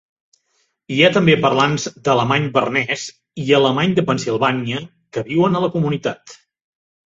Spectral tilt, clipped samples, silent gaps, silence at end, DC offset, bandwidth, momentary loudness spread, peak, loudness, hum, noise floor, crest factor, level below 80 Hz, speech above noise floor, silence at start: -5.5 dB/octave; under 0.1%; none; 0.8 s; under 0.1%; 8 kHz; 13 LU; -2 dBFS; -17 LUFS; none; -66 dBFS; 18 dB; -56 dBFS; 49 dB; 0.9 s